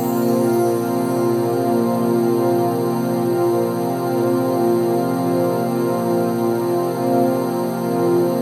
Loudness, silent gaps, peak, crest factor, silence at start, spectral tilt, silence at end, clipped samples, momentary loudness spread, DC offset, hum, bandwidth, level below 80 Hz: -19 LUFS; none; -6 dBFS; 12 dB; 0 s; -7 dB/octave; 0 s; under 0.1%; 3 LU; under 0.1%; none; 16 kHz; -68 dBFS